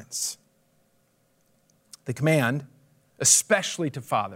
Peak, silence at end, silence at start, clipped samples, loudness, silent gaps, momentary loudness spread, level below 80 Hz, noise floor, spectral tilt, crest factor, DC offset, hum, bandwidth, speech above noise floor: -4 dBFS; 0 s; 0 s; under 0.1%; -23 LUFS; none; 17 LU; -74 dBFS; -67 dBFS; -3 dB/octave; 22 dB; under 0.1%; none; 16 kHz; 43 dB